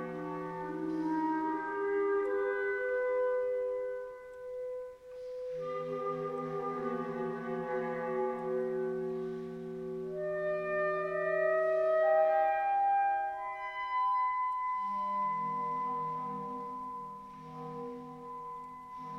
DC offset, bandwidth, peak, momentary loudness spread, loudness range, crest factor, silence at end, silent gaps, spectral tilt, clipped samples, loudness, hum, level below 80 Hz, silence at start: under 0.1%; 8.8 kHz; -18 dBFS; 15 LU; 8 LU; 16 dB; 0 s; none; -7.5 dB/octave; under 0.1%; -34 LUFS; none; -70 dBFS; 0 s